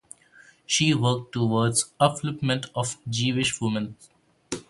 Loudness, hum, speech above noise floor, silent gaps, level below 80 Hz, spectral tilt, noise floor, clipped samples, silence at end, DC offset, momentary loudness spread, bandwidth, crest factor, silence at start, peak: -24 LUFS; none; 30 dB; none; -58 dBFS; -4 dB/octave; -55 dBFS; under 0.1%; 0.1 s; under 0.1%; 8 LU; 11.5 kHz; 22 dB; 0.7 s; -4 dBFS